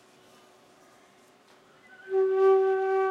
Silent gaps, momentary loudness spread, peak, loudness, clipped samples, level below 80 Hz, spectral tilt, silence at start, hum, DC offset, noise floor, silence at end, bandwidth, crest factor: none; 6 LU; -14 dBFS; -24 LUFS; under 0.1%; -88 dBFS; -5 dB/octave; 2.05 s; none; under 0.1%; -58 dBFS; 0 s; 6 kHz; 14 dB